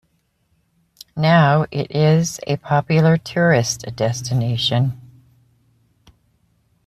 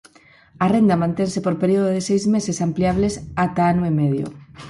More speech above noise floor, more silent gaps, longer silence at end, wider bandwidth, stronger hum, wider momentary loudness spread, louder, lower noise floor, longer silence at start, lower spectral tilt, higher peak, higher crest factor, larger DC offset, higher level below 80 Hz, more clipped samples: first, 48 dB vs 31 dB; neither; first, 1.9 s vs 0 s; first, 13.5 kHz vs 11.5 kHz; neither; first, 9 LU vs 6 LU; about the same, -18 LUFS vs -20 LUFS; first, -65 dBFS vs -50 dBFS; first, 1.15 s vs 0.6 s; about the same, -5.5 dB/octave vs -6.5 dB/octave; first, -2 dBFS vs -6 dBFS; about the same, 16 dB vs 14 dB; neither; second, -54 dBFS vs -46 dBFS; neither